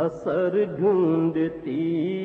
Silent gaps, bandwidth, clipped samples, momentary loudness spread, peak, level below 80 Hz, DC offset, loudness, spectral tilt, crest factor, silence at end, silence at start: none; 4.3 kHz; under 0.1%; 6 LU; -10 dBFS; -62 dBFS; under 0.1%; -24 LUFS; -9.5 dB/octave; 12 dB; 0 s; 0 s